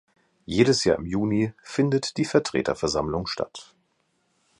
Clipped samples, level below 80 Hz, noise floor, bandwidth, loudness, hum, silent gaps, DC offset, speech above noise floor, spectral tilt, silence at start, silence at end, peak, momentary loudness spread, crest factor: under 0.1%; -50 dBFS; -70 dBFS; 11.5 kHz; -24 LUFS; none; none; under 0.1%; 46 dB; -5 dB/octave; 0.5 s; 0.95 s; -4 dBFS; 9 LU; 20 dB